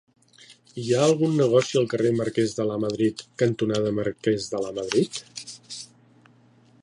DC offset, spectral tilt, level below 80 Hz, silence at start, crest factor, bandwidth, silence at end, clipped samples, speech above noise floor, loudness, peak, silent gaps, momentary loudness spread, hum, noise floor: under 0.1%; -5.5 dB/octave; -62 dBFS; 0.5 s; 18 dB; 11.5 kHz; 0.95 s; under 0.1%; 33 dB; -24 LUFS; -6 dBFS; none; 17 LU; none; -57 dBFS